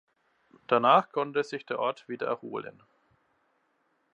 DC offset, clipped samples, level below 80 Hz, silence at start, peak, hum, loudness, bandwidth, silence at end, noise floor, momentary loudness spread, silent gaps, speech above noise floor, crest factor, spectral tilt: under 0.1%; under 0.1%; -84 dBFS; 0.7 s; -8 dBFS; none; -28 LUFS; 9.6 kHz; 1.45 s; -73 dBFS; 16 LU; none; 45 dB; 24 dB; -5.5 dB/octave